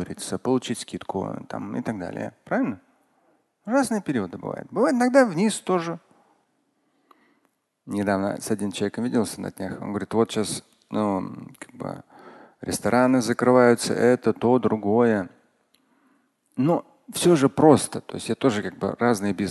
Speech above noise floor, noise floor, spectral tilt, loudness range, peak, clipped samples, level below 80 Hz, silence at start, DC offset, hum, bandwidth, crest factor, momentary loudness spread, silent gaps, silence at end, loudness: 47 dB; -70 dBFS; -5.5 dB/octave; 8 LU; -2 dBFS; under 0.1%; -58 dBFS; 0 s; under 0.1%; none; 12.5 kHz; 22 dB; 15 LU; none; 0 s; -23 LUFS